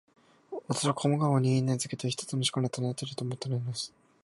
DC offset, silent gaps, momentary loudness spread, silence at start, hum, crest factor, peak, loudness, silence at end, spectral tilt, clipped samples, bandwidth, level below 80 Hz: under 0.1%; none; 10 LU; 0.5 s; none; 18 dB; -12 dBFS; -30 LUFS; 0.35 s; -5.5 dB/octave; under 0.1%; 11.5 kHz; -70 dBFS